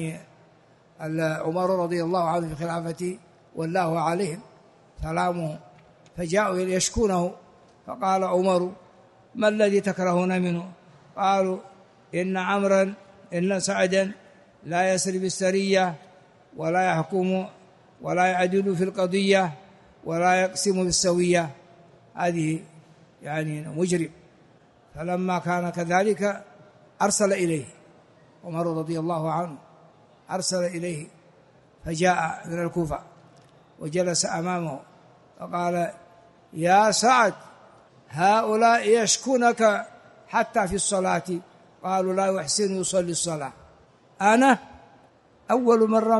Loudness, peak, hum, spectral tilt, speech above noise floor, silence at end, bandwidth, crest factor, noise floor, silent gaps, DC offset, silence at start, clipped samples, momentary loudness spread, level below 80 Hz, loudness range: -24 LUFS; -6 dBFS; none; -4.5 dB/octave; 33 dB; 0 s; 11.5 kHz; 20 dB; -57 dBFS; none; under 0.1%; 0 s; under 0.1%; 15 LU; -54 dBFS; 7 LU